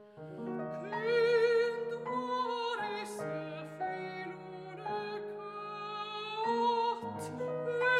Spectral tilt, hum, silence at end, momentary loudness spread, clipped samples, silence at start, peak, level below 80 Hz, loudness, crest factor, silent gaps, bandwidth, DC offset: -5 dB/octave; none; 0 s; 13 LU; under 0.1%; 0 s; -20 dBFS; -82 dBFS; -35 LUFS; 16 dB; none; 13 kHz; under 0.1%